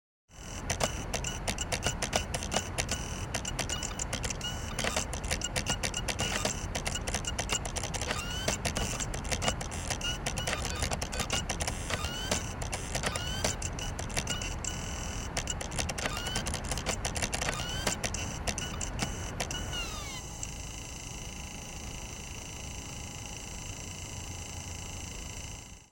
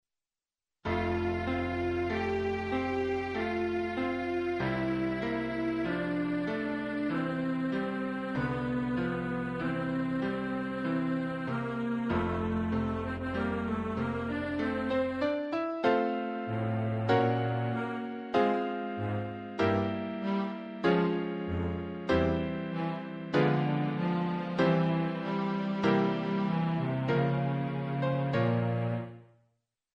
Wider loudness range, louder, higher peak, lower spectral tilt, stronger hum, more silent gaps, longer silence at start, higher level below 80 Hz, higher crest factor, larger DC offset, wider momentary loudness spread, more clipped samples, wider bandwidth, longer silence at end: first, 8 LU vs 3 LU; second, -34 LUFS vs -31 LUFS; first, -8 dBFS vs -14 dBFS; second, -2.5 dB/octave vs -8.5 dB/octave; neither; neither; second, 0.3 s vs 0.85 s; first, -42 dBFS vs -54 dBFS; first, 26 dB vs 18 dB; neither; first, 9 LU vs 6 LU; neither; first, 17 kHz vs 9.8 kHz; second, 0.05 s vs 0.7 s